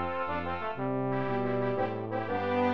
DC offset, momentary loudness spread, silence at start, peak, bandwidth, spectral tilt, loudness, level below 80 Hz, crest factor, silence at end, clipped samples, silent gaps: 0.6%; 3 LU; 0 s; -16 dBFS; 6.6 kHz; -9 dB/octave; -32 LUFS; -64 dBFS; 14 dB; 0 s; under 0.1%; none